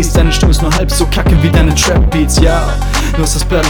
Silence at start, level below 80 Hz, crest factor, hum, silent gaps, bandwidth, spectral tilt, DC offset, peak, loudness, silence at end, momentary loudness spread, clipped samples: 0 s; -12 dBFS; 10 dB; none; none; over 20 kHz; -4.5 dB/octave; under 0.1%; 0 dBFS; -11 LUFS; 0 s; 5 LU; 0.3%